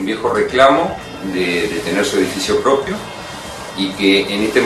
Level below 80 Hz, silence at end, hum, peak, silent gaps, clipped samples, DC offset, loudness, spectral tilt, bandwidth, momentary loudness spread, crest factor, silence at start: -46 dBFS; 0 s; none; 0 dBFS; none; under 0.1%; under 0.1%; -16 LUFS; -4 dB/octave; 14 kHz; 15 LU; 16 dB; 0 s